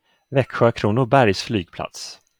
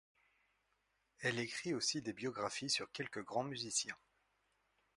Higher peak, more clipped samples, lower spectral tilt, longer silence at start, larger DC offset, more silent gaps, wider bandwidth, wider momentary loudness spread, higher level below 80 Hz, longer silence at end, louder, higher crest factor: first, -2 dBFS vs -24 dBFS; neither; first, -6 dB/octave vs -2.5 dB/octave; second, 0.3 s vs 1.2 s; neither; neither; first, 18 kHz vs 11.5 kHz; first, 15 LU vs 7 LU; first, -54 dBFS vs -80 dBFS; second, 0.25 s vs 1 s; first, -19 LUFS vs -40 LUFS; about the same, 18 dB vs 20 dB